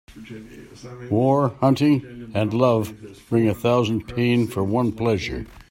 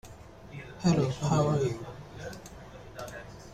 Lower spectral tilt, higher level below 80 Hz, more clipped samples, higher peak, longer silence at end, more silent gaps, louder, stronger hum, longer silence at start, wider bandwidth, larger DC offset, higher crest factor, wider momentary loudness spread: about the same, -7.5 dB/octave vs -6.5 dB/octave; first, -48 dBFS vs -54 dBFS; neither; first, -4 dBFS vs -14 dBFS; about the same, 0.1 s vs 0 s; neither; first, -21 LUFS vs -28 LUFS; neither; about the same, 0.1 s vs 0.05 s; first, 16 kHz vs 13.5 kHz; neither; about the same, 18 dB vs 18 dB; about the same, 20 LU vs 21 LU